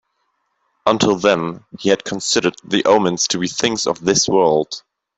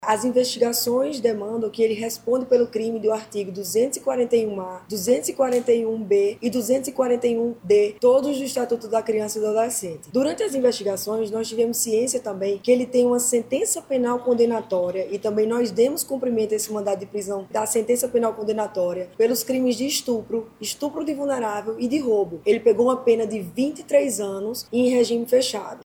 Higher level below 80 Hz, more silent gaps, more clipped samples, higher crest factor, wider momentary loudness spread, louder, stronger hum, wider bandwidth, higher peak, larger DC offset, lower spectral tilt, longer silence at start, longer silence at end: first, -56 dBFS vs -62 dBFS; neither; neither; about the same, 16 dB vs 16 dB; about the same, 7 LU vs 7 LU; first, -17 LUFS vs -22 LUFS; neither; second, 8.4 kHz vs 18 kHz; first, -2 dBFS vs -6 dBFS; neither; about the same, -3.5 dB/octave vs -3.5 dB/octave; first, 0.85 s vs 0 s; first, 0.4 s vs 0.05 s